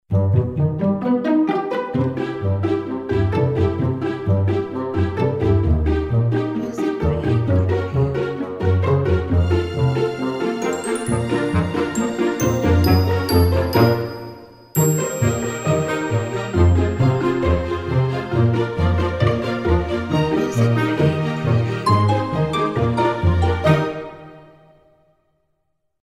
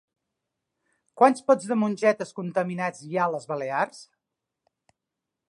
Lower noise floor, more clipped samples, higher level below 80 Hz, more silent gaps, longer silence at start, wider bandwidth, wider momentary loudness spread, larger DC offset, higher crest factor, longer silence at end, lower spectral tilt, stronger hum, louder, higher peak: second, -72 dBFS vs -85 dBFS; neither; first, -32 dBFS vs -80 dBFS; neither; second, 0.1 s vs 1.15 s; first, 16 kHz vs 11 kHz; second, 6 LU vs 10 LU; neither; second, 16 dB vs 22 dB; first, 1.6 s vs 1.45 s; about the same, -7 dB/octave vs -6 dB/octave; neither; first, -19 LUFS vs -25 LUFS; about the same, -2 dBFS vs -4 dBFS